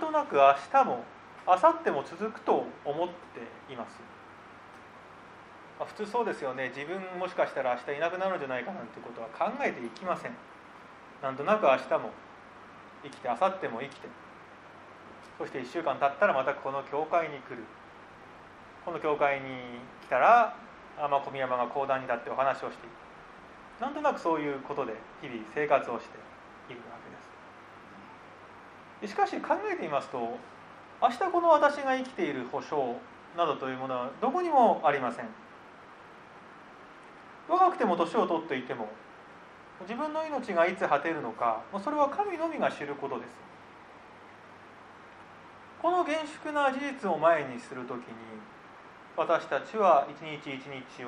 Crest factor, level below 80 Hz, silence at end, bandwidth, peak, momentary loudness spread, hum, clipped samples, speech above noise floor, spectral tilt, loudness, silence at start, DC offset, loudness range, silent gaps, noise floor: 24 dB; -72 dBFS; 0 s; 11 kHz; -8 dBFS; 25 LU; none; under 0.1%; 22 dB; -5.5 dB/octave; -29 LUFS; 0 s; under 0.1%; 8 LU; none; -51 dBFS